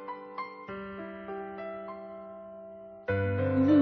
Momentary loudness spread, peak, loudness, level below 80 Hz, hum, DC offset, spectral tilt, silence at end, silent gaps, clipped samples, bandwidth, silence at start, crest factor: 17 LU; -14 dBFS; -34 LUFS; -64 dBFS; none; under 0.1%; -7.5 dB/octave; 0 s; none; under 0.1%; 4.8 kHz; 0 s; 18 dB